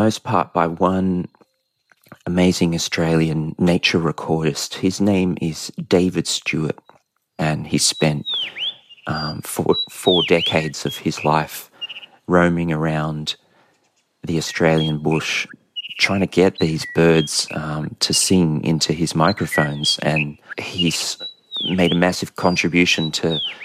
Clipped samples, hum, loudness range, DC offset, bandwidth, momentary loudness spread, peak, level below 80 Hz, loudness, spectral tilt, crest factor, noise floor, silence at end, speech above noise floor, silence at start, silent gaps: under 0.1%; none; 4 LU; under 0.1%; 15 kHz; 11 LU; 0 dBFS; -48 dBFS; -19 LUFS; -4.5 dB/octave; 18 dB; -64 dBFS; 0 s; 45 dB; 0 s; none